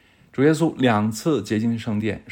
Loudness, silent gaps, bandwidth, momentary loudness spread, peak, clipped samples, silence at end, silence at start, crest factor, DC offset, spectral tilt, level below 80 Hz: -21 LUFS; none; 17 kHz; 7 LU; -6 dBFS; under 0.1%; 0 s; 0.35 s; 16 dB; under 0.1%; -6.5 dB/octave; -58 dBFS